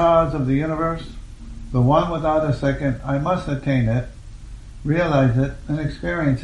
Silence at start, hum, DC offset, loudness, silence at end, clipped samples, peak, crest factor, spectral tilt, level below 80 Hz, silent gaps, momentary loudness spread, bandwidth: 0 s; none; under 0.1%; -21 LUFS; 0 s; under 0.1%; -4 dBFS; 16 dB; -8.5 dB/octave; -36 dBFS; none; 22 LU; 9.8 kHz